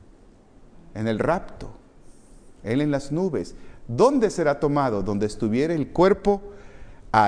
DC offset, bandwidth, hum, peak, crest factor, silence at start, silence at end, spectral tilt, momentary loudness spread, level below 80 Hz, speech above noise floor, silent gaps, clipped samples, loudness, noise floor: under 0.1%; 10.5 kHz; none; -4 dBFS; 20 dB; 0.6 s; 0 s; -7 dB/octave; 19 LU; -44 dBFS; 28 dB; none; under 0.1%; -23 LUFS; -51 dBFS